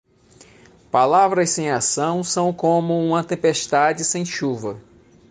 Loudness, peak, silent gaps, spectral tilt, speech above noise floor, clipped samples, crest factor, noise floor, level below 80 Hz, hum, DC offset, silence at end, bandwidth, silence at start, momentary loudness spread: -19 LUFS; -4 dBFS; none; -4 dB/octave; 31 dB; under 0.1%; 16 dB; -51 dBFS; -60 dBFS; none; under 0.1%; 0.5 s; 10 kHz; 0.95 s; 8 LU